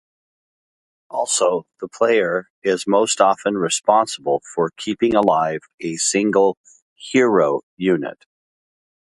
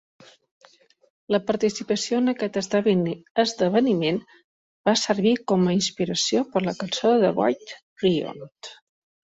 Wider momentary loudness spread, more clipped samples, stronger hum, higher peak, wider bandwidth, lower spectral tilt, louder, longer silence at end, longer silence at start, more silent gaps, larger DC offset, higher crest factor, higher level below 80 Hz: about the same, 10 LU vs 9 LU; neither; neither; first, 0 dBFS vs -6 dBFS; first, 11.5 kHz vs 8 kHz; second, -3.5 dB/octave vs -5 dB/octave; first, -19 LUFS vs -23 LUFS; first, 0.9 s vs 0.65 s; second, 1.1 s vs 1.3 s; second, 2.50-2.62 s, 5.74-5.78 s, 6.57-6.64 s, 6.82-6.96 s, 7.63-7.77 s vs 3.30-3.35 s, 4.44-4.84 s, 7.83-7.96 s; neither; about the same, 20 dB vs 16 dB; about the same, -62 dBFS vs -64 dBFS